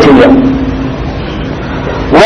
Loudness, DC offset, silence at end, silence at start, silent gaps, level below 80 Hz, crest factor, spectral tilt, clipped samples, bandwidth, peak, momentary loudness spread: -10 LUFS; under 0.1%; 0 s; 0 s; none; -22 dBFS; 8 dB; -7 dB/octave; 4%; 7.8 kHz; 0 dBFS; 13 LU